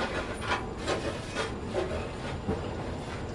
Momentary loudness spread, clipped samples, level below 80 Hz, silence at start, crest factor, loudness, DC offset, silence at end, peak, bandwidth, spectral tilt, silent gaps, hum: 4 LU; under 0.1%; -44 dBFS; 0 s; 18 dB; -34 LUFS; under 0.1%; 0 s; -16 dBFS; 11.5 kHz; -5 dB/octave; none; none